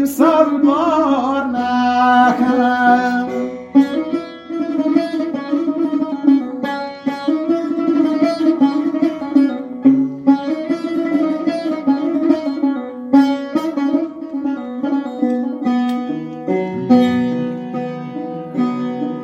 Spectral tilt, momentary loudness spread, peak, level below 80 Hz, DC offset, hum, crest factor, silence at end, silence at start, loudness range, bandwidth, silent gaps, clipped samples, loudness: -6.5 dB/octave; 10 LU; 0 dBFS; -58 dBFS; under 0.1%; none; 16 dB; 0 s; 0 s; 4 LU; 13.5 kHz; none; under 0.1%; -17 LUFS